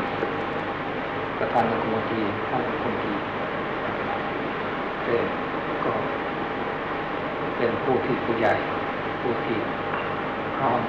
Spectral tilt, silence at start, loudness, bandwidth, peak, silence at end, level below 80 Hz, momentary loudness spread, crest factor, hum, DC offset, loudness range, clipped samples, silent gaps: -7.5 dB/octave; 0 s; -26 LUFS; 7.8 kHz; -10 dBFS; 0 s; -52 dBFS; 5 LU; 16 dB; none; under 0.1%; 2 LU; under 0.1%; none